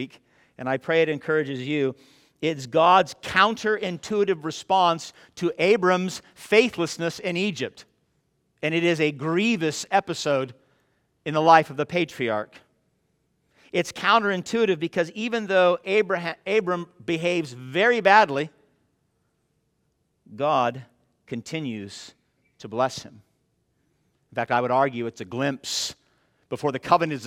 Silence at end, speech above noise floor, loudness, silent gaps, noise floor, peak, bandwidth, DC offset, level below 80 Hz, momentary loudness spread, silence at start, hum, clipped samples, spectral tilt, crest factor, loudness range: 0 s; 48 dB; -23 LUFS; none; -72 dBFS; -2 dBFS; 16 kHz; under 0.1%; -68 dBFS; 14 LU; 0 s; none; under 0.1%; -4.5 dB/octave; 22 dB; 8 LU